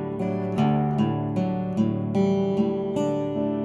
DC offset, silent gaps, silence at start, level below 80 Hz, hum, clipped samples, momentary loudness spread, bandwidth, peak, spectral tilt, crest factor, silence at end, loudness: under 0.1%; none; 0 s; -54 dBFS; none; under 0.1%; 4 LU; 8 kHz; -10 dBFS; -9 dB/octave; 14 dB; 0 s; -25 LUFS